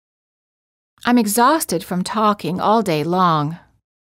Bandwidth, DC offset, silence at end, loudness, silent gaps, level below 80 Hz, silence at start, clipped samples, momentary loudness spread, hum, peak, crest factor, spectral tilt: 16 kHz; under 0.1%; 0.45 s; -18 LUFS; none; -58 dBFS; 1.05 s; under 0.1%; 8 LU; none; -2 dBFS; 16 dB; -5 dB/octave